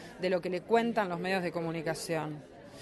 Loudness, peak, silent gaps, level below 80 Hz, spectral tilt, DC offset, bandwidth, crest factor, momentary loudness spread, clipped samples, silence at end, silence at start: -32 LUFS; -14 dBFS; none; -68 dBFS; -5.5 dB/octave; under 0.1%; 12 kHz; 20 dB; 10 LU; under 0.1%; 0 s; 0 s